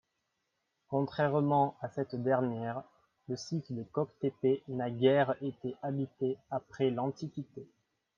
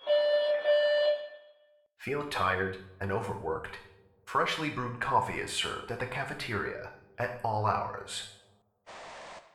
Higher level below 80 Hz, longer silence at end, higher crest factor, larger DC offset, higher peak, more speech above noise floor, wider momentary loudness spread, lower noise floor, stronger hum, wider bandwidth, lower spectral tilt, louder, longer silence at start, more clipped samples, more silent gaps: second, -76 dBFS vs -60 dBFS; first, 0.5 s vs 0.15 s; about the same, 20 dB vs 18 dB; neither; about the same, -12 dBFS vs -14 dBFS; first, 50 dB vs 32 dB; second, 13 LU vs 19 LU; first, -82 dBFS vs -65 dBFS; neither; second, 7.2 kHz vs 13 kHz; first, -7.5 dB/octave vs -4 dB/octave; about the same, -33 LUFS vs -31 LUFS; first, 0.9 s vs 0 s; neither; neither